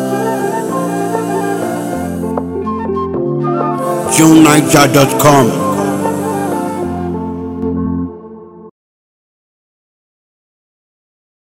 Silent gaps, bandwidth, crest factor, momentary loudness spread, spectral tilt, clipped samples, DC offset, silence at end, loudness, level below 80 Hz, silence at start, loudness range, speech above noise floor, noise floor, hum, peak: none; over 20 kHz; 14 dB; 12 LU; -5 dB/octave; 0.7%; under 0.1%; 2.85 s; -13 LUFS; -44 dBFS; 0 s; 14 LU; 26 dB; -33 dBFS; none; 0 dBFS